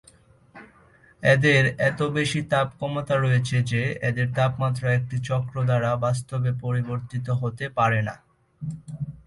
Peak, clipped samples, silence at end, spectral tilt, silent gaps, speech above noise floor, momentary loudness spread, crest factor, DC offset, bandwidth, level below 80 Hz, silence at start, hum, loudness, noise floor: -6 dBFS; under 0.1%; 0.1 s; -6 dB/octave; none; 32 dB; 11 LU; 18 dB; under 0.1%; 11.5 kHz; -54 dBFS; 0.55 s; none; -24 LUFS; -55 dBFS